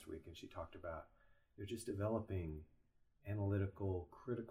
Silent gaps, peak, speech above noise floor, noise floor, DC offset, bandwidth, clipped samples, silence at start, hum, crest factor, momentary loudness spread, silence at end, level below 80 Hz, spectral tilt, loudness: none; -28 dBFS; 29 dB; -73 dBFS; under 0.1%; 15 kHz; under 0.1%; 0 s; none; 18 dB; 13 LU; 0 s; -64 dBFS; -7.5 dB/octave; -46 LUFS